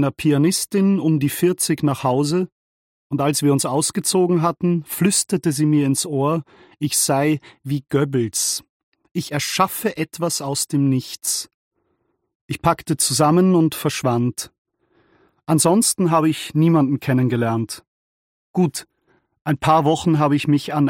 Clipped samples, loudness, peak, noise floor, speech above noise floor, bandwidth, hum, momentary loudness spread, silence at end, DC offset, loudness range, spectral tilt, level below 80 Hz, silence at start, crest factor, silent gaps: under 0.1%; -19 LUFS; -2 dBFS; -69 dBFS; 51 dB; 17 kHz; none; 10 LU; 0 s; under 0.1%; 3 LU; -5 dB/octave; -56 dBFS; 0 s; 18 dB; 2.52-3.10 s, 8.69-8.92 s, 11.54-11.71 s, 12.35-12.49 s, 14.58-14.65 s, 17.87-18.54 s, 19.41-19.45 s